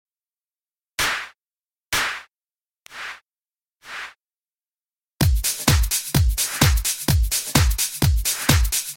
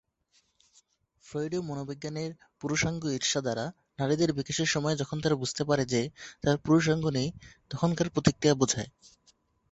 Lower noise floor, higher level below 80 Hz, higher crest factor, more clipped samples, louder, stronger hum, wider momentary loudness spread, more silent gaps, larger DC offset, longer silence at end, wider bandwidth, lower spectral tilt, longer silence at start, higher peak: first, under -90 dBFS vs -71 dBFS; first, -28 dBFS vs -56 dBFS; about the same, 22 dB vs 24 dB; neither; first, -20 LUFS vs -29 LUFS; neither; first, 16 LU vs 12 LU; first, 1.47-1.51 s, 1.86-1.90 s, 3.68-3.72 s, 5.13-5.17 s vs none; neither; second, 0 s vs 0.85 s; first, 17 kHz vs 8.2 kHz; second, -3 dB/octave vs -4.5 dB/octave; second, 1 s vs 1.25 s; first, 0 dBFS vs -6 dBFS